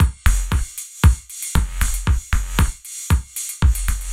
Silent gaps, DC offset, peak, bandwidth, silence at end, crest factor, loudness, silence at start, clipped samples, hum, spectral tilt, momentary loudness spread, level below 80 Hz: none; under 0.1%; 0 dBFS; 16.5 kHz; 0 s; 18 dB; -21 LUFS; 0 s; under 0.1%; none; -4 dB/octave; 7 LU; -20 dBFS